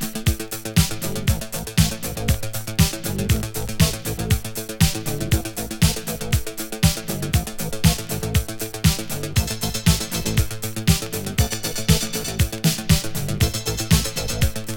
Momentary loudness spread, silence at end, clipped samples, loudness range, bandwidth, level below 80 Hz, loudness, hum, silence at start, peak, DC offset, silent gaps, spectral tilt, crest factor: 6 LU; 0 s; under 0.1%; 1 LU; over 20 kHz; -30 dBFS; -22 LUFS; none; 0 s; -2 dBFS; under 0.1%; none; -4 dB/octave; 20 dB